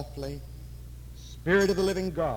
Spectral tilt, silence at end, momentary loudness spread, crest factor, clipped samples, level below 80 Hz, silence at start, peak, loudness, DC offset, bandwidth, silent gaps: -5.5 dB/octave; 0 s; 21 LU; 16 dB; under 0.1%; -44 dBFS; 0 s; -14 dBFS; -27 LUFS; under 0.1%; 18.5 kHz; none